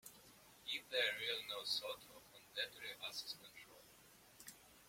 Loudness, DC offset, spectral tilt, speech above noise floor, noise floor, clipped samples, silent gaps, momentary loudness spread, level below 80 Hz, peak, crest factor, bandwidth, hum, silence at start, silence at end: -43 LUFS; under 0.1%; 0 dB/octave; 21 dB; -66 dBFS; under 0.1%; none; 24 LU; -82 dBFS; -24 dBFS; 24 dB; 16.5 kHz; none; 0.05 s; 0 s